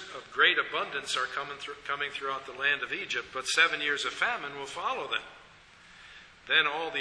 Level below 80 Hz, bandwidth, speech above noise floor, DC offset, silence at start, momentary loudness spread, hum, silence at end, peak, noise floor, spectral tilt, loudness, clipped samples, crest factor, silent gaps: -68 dBFS; 11 kHz; 25 dB; under 0.1%; 0 s; 14 LU; none; 0 s; -8 dBFS; -55 dBFS; -0.5 dB/octave; -29 LUFS; under 0.1%; 24 dB; none